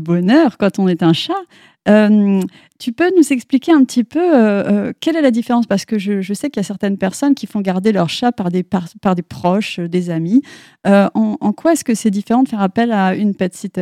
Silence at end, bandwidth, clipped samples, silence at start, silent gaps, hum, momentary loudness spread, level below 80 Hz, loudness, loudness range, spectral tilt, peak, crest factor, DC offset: 0 s; 14 kHz; under 0.1%; 0 s; none; none; 8 LU; -58 dBFS; -15 LUFS; 4 LU; -6 dB/octave; 0 dBFS; 14 dB; under 0.1%